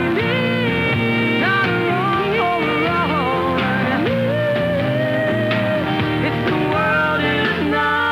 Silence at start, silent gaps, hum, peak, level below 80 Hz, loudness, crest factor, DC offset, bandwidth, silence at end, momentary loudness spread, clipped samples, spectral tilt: 0 s; none; none; -6 dBFS; -44 dBFS; -18 LUFS; 12 dB; under 0.1%; 17 kHz; 0 s; 2 LU; under 0.1%; -7 dB/octave